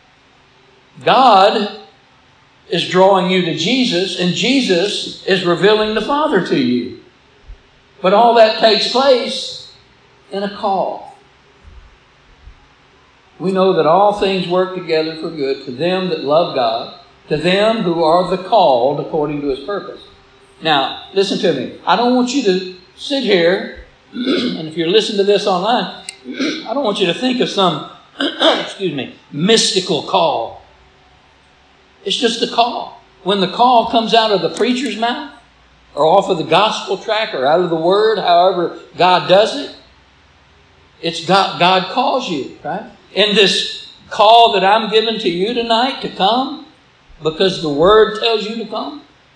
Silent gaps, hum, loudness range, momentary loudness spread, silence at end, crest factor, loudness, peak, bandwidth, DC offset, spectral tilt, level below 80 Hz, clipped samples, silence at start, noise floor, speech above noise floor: none; none; 4 LU; 13 LU; 0.35 s; 16 dB; -15 LUFS; 0 dBFS; 10.5 kHz; under 0.1%; -4.5 dB/octave; -52 dBFS; under 0.1%; 0.95 s; -50 dBFS; 35 dB